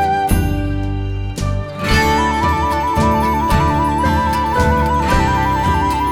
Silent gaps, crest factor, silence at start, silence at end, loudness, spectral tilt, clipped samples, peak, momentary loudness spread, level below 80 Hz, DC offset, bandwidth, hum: none; 14 dB; 0 s; 0 s; -16 LUFS; -6 dB/octave; under 0.1%; -2 dBFS; 7 LU; -22 dBFS; under 0.1%; 18 kHz; none